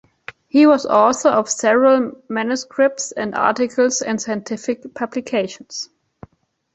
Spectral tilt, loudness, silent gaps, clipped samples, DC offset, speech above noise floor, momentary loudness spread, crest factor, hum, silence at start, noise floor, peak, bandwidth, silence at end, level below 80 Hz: -3.5 dB/octave; -18 LUFS; none; under 0.1%; under 0.1%; 37 dB; 14 LU; 16 dB; none; 0.55 s; -55 dBFS; -2 dBFS; 8.2 kHz; 0.9 s; -62 dBFS